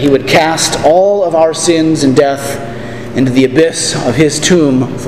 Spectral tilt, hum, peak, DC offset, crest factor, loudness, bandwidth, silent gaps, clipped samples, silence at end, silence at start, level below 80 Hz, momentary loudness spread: -4.5 dB/octave; none; 0 dBFS; 2%; 10 dB; -10 LUFS; 15.5 kHz; none; 0.4%; 0 s; 0 s; -40 dBFS; 10 LU